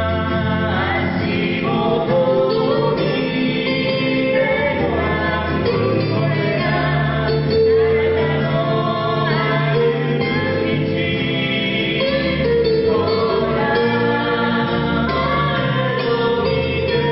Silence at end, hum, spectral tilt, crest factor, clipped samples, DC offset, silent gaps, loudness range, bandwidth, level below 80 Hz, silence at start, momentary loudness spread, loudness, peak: 0 s; none; -11 dB/octave; 12 dB; under 0.1%; under 0.1%; none; 1 LU; 5.8 kHz; -36 dBFS; 0 s; 3 LU; -18 LUFS; -6 dBFS